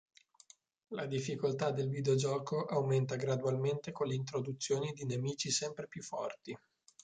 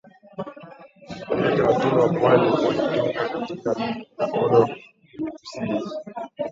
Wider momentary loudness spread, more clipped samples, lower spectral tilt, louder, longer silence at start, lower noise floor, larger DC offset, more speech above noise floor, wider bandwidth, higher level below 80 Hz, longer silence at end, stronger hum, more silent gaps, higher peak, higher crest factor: second, 10 LU vs 18 LU; neither; second, -5 dB/octave vs -7 dB/octave; second, -36 LUFS vs -22 LUFS; first, 0.9 s vs 0.35 s; first, -64 dBFS vs -45 dBFS; neither; first, 29 dB vs 24 dB; first, 9.6 kHz vs 7.6 kHz; second, -74 dBFS vs -58 dBFS; first, 0.45 s vs 0 s; neither; neither; second, -20 dBFS vs -4 dBFS; about the same, 16 dB vs 20 dB